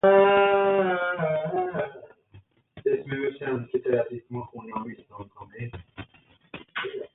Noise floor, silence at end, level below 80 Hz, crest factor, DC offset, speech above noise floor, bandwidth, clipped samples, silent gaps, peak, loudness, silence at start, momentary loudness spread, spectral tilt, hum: -55 dBFS; 0.1 s; -60 dBFS; 20 dB; under 0.1%; 24 dB; 4 kHz; under 0.1%; none; -8 dBFS; -26 LUFS; 0.05 s; 24 LU; -10 dB/octave; none